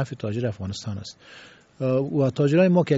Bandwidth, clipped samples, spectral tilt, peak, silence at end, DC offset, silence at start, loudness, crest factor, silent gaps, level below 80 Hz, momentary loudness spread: 8 kHz; under 0.1%; -7 dB/octave; -6 dBFS; 0 s; under 0.1%; 0 s; -24 LUFS; 16 dB; none; -60 dBFS; 17 LU